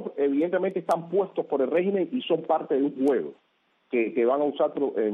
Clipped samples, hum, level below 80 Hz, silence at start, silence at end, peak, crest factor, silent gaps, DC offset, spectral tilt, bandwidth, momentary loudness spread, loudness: under 0.1%; none; -76 dBFS; 0 s; 0 s; -10 dBFS; 14 dB; none; under 0.1%; -7.5 dB/octave; 10 kHz; 4 LU; -26 LUFS